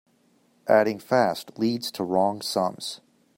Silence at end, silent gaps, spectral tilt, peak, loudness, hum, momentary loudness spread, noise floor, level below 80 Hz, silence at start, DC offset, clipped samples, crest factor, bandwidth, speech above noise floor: 0.4 s; none; -4.5 dB/octave; -6 dBFS; -25 LUFS; none; 14 LU; -64 dBFS; -72 dBFS; 0.65 s; under 0.1%; under 0.1%; 20 dB; 16.5 kHz; 40 dB